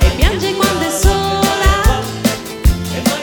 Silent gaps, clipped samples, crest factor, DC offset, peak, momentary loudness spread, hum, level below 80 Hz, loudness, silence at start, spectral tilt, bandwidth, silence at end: none; under 0.1%; 14 dB; under 0.1%; 0 dBFS; 5 LU; none; -16 dBFS; -15 LUFS; 0 s; -4.5 dB/octave; 20 kHz; 0 s